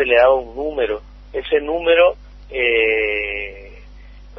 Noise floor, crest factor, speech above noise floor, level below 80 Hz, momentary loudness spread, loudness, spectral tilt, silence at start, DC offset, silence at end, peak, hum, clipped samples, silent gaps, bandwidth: -39 dBFS; 18 dB; 23 dB; -40 dBFS; 15 LU; -17 LUFS; -6 dB/octave; 0 s; under 0.1%; 0 s; -2 dBFS; none; under 0.1%; none; 5.8 kHz